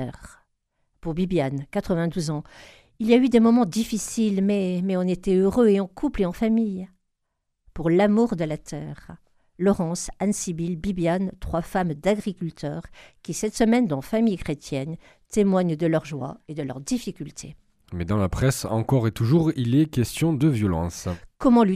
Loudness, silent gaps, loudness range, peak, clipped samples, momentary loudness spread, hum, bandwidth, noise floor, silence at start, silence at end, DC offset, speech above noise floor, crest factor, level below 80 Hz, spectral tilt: -24 LUFS; none; 5 LU; -4 dBFS; under 0.1%; 14 LU; none; 14.5 kHz; -77 dBFS; 0 s; 0 s; under 0.1%; 54 dB; 18 dB; -46 dBFS; -6.5 dB/octave